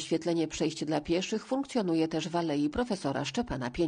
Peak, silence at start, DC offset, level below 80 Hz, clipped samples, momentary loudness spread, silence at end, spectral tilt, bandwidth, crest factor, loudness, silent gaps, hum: -16 dBFS; 0 s; under 0.1%; -54 dBFS; under 0.1%; 3 LU; 0 s; -5 dB/octave; 10 kHz; 14 dB; -31 LUFS; none; none